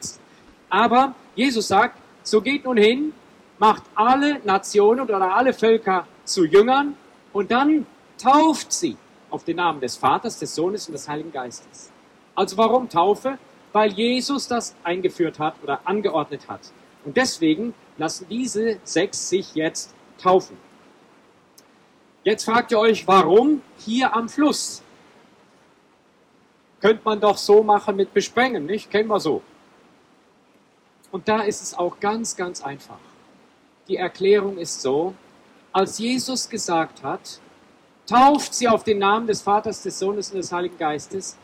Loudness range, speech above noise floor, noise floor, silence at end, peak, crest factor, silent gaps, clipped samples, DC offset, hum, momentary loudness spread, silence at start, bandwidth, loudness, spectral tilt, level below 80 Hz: 7 LU; 37 dB; -57 dBFS; 0.1 s; -6 dBFS; 16 dB; none; under 0.1%; under 0.1%; none; 14 LU; 0 s; 14.5 kHz; -21 LUFS; -4 dB/octave; -64 dBFS